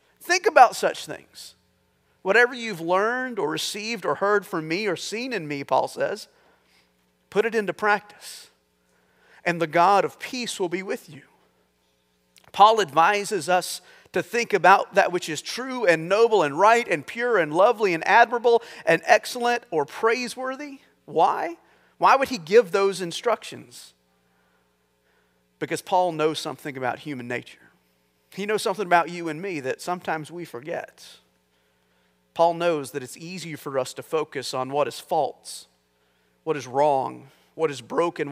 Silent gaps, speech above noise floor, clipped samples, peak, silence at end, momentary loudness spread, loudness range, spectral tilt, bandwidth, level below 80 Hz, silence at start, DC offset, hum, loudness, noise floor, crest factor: none; 44 dB; under 0.1%; 0 dBFS; 0 s; 16 LU; 8 LU; -3.5 dB/octave; 16 kHz; -76 dBFS; 0.2 s; under 0.1%; 60 Hz at -65 dBFS; -23 LUFS; -67 dBFS; 24 dB